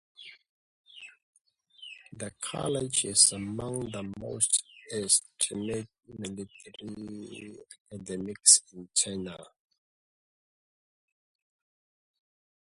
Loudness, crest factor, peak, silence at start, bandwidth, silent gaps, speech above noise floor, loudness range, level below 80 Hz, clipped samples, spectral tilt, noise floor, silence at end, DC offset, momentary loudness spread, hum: -26 LUFS; 28 dB; -6 dBFS; 0.2 s; 12 kHz; 0.49-0.84 s, 1.23-1.33 s, 7.80-7.85 s; 20 dB; 9 LU; -64 dBFS; under 0.1%; -2 dB/octave; -50 dBFS; 3.3 s; under 0.1%; 25 LU; none